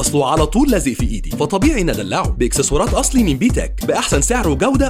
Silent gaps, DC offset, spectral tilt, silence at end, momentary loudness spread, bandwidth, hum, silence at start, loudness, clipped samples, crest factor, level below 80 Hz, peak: none; 0.2%; -4.5 dB/octave; 0 s; 5 LU; 16 kHz; none; 0 s; -16 LUFS; under 0.1%; 14 dB; -22 dBFS; -2 dBFS